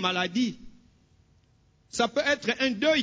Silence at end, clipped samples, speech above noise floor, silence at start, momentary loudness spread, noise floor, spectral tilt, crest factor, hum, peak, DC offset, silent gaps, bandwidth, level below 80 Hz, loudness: 0 s; under 0.1%; 37 dB; 0 s; 9 LU; -64 dBFS; -3.5 dB/octave; 18 dB; none; -10 dBFS; under 0.1%; none; 8 kHz; -62 dBFS; -27 LUFS